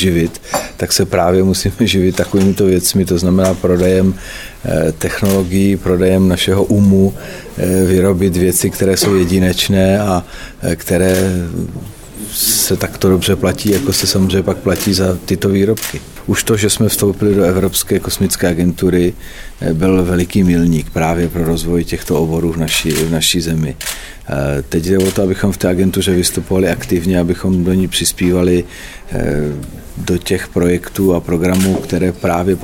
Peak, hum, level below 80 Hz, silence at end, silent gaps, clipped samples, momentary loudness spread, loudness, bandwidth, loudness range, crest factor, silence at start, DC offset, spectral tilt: 0 dBFS; none; -32 dBFS; 0 s; none; under 0.1%; 9 LU; -14 LUFS; 17.5 kHz; 3 LU; 14 dB; 0 s; under 0.1%; -5 dB/octave